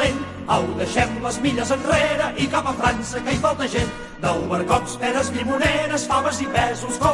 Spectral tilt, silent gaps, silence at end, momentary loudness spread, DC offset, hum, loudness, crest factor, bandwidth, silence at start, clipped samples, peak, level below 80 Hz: -4.5 dB/octave; none; 0 s; 4 LU; under 0.1%; none; -21 LUFS; 16 dB; 11.5 kHz; 0 s; under 0.1%; -4 dBFS; -40 dBFS